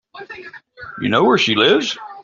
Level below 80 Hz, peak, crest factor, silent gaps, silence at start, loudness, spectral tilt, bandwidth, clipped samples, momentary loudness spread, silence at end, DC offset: -58 dBFS; -2 dBFS; 16 dB; none; 0.15 s; -15 LUFS; -4 dB/octave; 7.6 kHz; under 0.1%; 22 LU; 0 s; under 0.1%